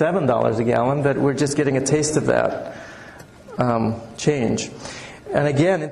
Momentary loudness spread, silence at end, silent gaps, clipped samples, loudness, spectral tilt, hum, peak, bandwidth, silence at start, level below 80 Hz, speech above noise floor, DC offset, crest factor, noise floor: 16 LU; 0 s; none; under 0.1%; -20 LUFS; -5.5 dB/octave; none; -6 dBFS; 12 kHz; 0 s; -50 dBFS; 22 dB; under 0.1%; 14 dB; -41 dBFS